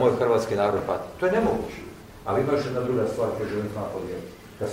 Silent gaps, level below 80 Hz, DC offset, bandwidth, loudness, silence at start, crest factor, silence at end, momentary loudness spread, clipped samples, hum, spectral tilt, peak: none; -50 dBFS; under 0.1%; 16 kHz; -26 LUFS; 0 s; 18 dB; 0 s; 14 LU; under 0.1%; none; -6.5 dB/octave; -8 dBFS